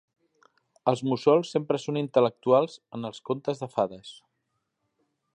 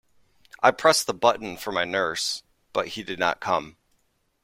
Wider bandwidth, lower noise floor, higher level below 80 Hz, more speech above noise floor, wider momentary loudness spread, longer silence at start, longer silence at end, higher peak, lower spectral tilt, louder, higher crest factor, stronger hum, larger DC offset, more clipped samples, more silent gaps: second, 10 kHz vs 16.5 kHz; first, -79 dBFS vs -69 dBFS; second, -74 dBFS vs -62 dBFS; first, 53 dB vs 45 dB; first, 14 LU vs 11 LU; first, 0.85 s vs 0.6 s; first, 1.2 s vs 0.75 s; second, -6 dBFS vs -2 dBFS; first, -6.5 dB/octave vs -2 dB/octave; about the same, -26 LUFS vs -24 LUFS; about the same, 22 dB vs 24 dB; neither; neither; neither; neither